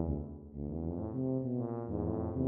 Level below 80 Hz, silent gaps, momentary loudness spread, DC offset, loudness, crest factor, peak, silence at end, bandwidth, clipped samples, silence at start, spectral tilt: -48 dBFS; none; 6 LU; under 0.1%; -38 LUFS; 18 dB; -18 dBFS; 0 s; 2.1 kHz; under 0.1%; 0 s; -14 dB/octave